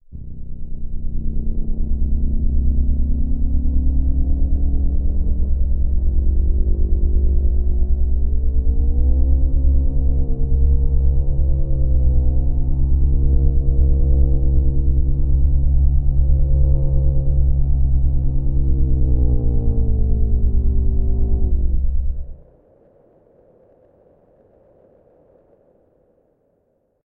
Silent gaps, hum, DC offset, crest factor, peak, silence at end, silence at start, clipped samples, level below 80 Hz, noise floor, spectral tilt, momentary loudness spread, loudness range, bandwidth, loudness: none; none; under 0.1%; 12 dB; -4 dBFS; 4.75 s; 0.1 s; under 0.1%; -16 dBFS; -65 dBFS; -17.5 dB/octave; 6 LU; 5 LU; 1 kHz; -20 LUFS